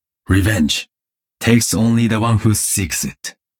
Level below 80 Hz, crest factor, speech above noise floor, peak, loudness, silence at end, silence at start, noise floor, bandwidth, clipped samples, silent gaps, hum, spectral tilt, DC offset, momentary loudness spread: -38 dBFS; 14 dB; 71 dB; -2 dBFS; -16 LUFS; 0.3 s; 0.3 s; -87 dBFS; 18.5 kHz; under 0.1%; none; none; -4.5 dB/octave; under 0.1%; 7 LU